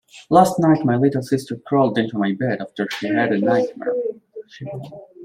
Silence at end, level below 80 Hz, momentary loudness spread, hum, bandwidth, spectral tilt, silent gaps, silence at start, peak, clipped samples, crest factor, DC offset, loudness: 0 s; -60 dBFS; 18 LU; none; 16 kHz; -7 dB/octave; none; 0.15 s; -2 dBFS; under 0.1%; 18 dB; under 0.1%; -19 LUFS